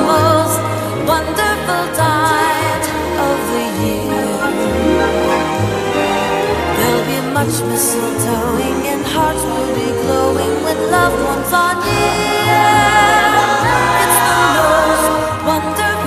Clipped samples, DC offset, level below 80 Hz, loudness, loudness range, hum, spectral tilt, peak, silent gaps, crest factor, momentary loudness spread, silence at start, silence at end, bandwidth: under 0.1%; under 0.1%; -34 dBFS; -14 LUFS; 4 LU; none; -4 dB/octave; 0 dBFS; none; 14 dB; 6 LU; 0 s; 0 s; 15.5 kHz